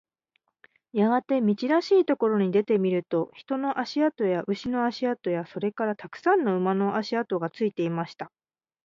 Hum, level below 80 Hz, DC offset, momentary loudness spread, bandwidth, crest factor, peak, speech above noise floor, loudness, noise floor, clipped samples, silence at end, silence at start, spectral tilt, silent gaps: none; -70 dBFS; under 0.1%; 8 LU; 7.4 kHz; 16 dB; -10 dBFS; 49 dB; -26 LUFS; -74 dBFS; under 0.1%; 0.6 s; 0.95 s; -7.5 dB/octave; none